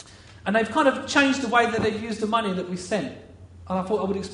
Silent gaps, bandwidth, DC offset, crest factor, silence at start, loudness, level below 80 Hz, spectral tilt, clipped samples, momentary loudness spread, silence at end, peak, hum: none; 10.5 kHz; under 0.1%; 20 dB; 0 s; -24 LUFS; -56 dBFS; -4.5 dB/octave; under 0.1%; 10 LU; 0 s; -4 dBFS; none